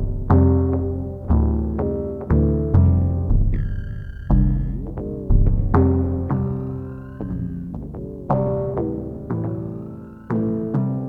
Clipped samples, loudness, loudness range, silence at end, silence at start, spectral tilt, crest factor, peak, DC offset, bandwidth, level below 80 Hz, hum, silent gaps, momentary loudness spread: under 0.1%; -22 LUFS; 6 LU; 0 s; 0 s; -12.5 dB/octave; 16 dB; -2 dBFS; under 0.1%; 2.4 kHz; -26 dBFS; none; none; 14 LU